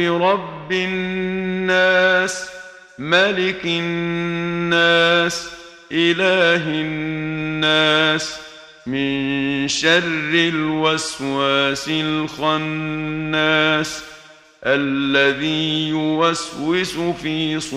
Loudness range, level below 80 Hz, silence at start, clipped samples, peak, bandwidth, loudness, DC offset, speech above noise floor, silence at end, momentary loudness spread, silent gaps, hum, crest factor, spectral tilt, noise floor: 2 LU; -54 dBFS; 0 s; under 0.1%; 0 dBFS; 13 kHz; -18 LUFS; under 0.1%; 26 dB; 0 s; 10 LU; none; none; 18 dB; -4 dB/octave; -44 dBFS